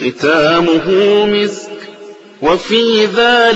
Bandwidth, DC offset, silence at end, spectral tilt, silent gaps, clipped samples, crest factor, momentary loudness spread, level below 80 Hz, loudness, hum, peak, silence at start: 8.2 kHz; under 0.1%; 0 s; -4.5 dB/octave; none; under 0.1%; 12 dB; 17 LU; -48 dBFS; -11 LUFS; none; 0 dBFS; 0 s